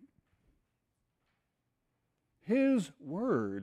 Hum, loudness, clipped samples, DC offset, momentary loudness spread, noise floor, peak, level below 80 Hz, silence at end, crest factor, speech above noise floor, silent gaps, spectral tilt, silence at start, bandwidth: none; -32 LUFS; under 0.1%; under 0.1%; 12 LU; -83 dBFS; -20 dBFS; -74 dBFS; 0 s; 16 dB; 51 dB; none; -7 dB/octave; 2.45 s; 11 kHz